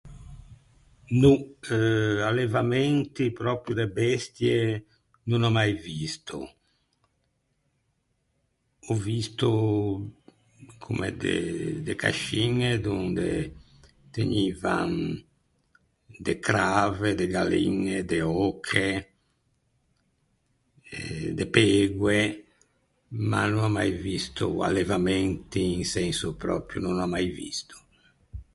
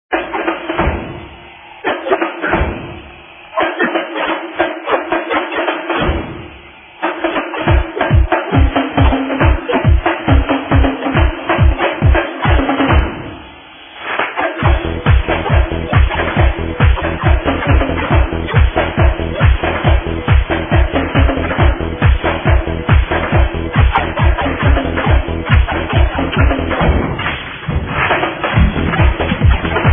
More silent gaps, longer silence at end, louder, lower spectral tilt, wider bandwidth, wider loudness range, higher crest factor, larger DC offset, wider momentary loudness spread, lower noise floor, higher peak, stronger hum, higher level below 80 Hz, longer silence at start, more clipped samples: neither; about the same, 0.1 s vs 0 s; second, -26 LUFS vs -15 LUFS; second, -5.5 dB/octave vs -10.5 dB/octave; first, 11.5 kHz vs 3.7 kHz; about the same, 5 LU vs 4 LU; first, 24 dB vs 14 dB; neither; first, 12 LU vs 8 LU; first, -73 dBFS vs -37 dBFS; second, -4 dBFS vs 0 dBFS; neither; second, -50 dBFS vs -18 dBFS; about the same, 0.05 s vs 0.1 s; neither